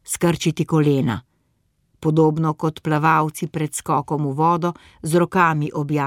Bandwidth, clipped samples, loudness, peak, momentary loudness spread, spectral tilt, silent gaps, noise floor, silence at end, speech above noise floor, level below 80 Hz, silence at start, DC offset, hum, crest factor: 16 kHz; under 0.1%; -20 LUFS; -4 dBFS; 8 LU; -6 dB/octave; none; -66 dBFS; 0 s; 47 dB; -54 dBFS; 0.05 s; under 0.1%; none; 16 dB